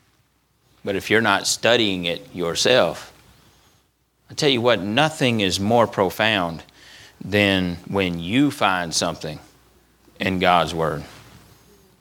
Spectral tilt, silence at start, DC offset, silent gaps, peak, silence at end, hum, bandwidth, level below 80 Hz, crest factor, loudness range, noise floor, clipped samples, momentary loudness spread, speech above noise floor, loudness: -4 dB/octave; 0.85 s; under 0.1%; none; 0 dBFS; 0.8 s; none; 19 kHz; -54 dBFS; 22 dB; 2 LU; -64 dBFS; under 0.1%; 15 LU; 43 dB; -20 LUFS